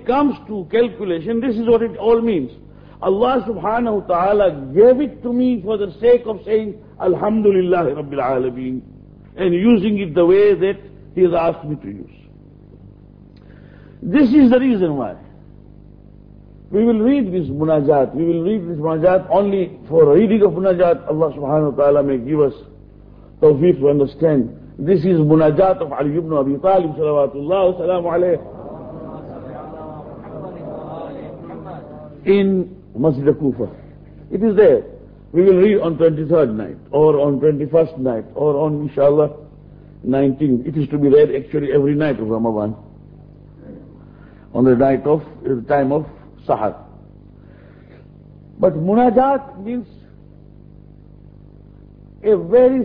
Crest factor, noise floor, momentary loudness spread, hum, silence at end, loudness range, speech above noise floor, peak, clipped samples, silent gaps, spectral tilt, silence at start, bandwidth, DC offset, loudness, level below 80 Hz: 16 dB; -43 dBFS; 18 LU; 50 Hz at -40 dBFS; 0 s; 7 LU; 27 dB; -2 dBFS; under 0.1%; none; -11 dB/octave; 0 s; 5.2 kHz; under 0.1%; -16 LUFS; -46 dBFS